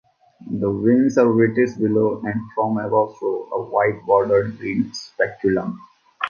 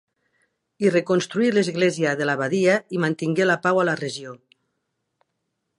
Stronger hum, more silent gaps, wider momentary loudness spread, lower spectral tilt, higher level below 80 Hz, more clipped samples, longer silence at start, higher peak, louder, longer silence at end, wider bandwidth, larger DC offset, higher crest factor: neither; neither; first, 10 LU vs 6 LU; first, -7 dB/octave vs -5.5 dB/octave; first, -56 dBFS vs -72 dBFS; neither; second, 0.4 s vs 0.8 s; about the same, -4 dBFS vs -6 dBFS; about the same, -20 LUFS vs -21 LUFS; second, 0 s vs 1.45 s; second, 7 kHz vs 11.5 kHz; neither; about the same, 16 dB vs 18 dB